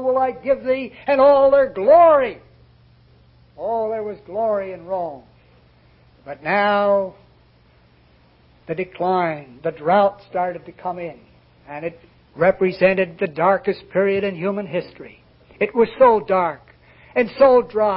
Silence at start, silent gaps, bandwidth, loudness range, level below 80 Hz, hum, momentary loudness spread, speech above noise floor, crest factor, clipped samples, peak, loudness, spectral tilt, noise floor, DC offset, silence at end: 0 s; none; 5.6 kHz; 8 LU; -56 dBFS; none; 16 LU; 35 dB; 16 dB; under 0.1%; -2 dBFS; -18 LUFS; -10.5 dB/octave; -54 dBFS; under 0.1%; 0 s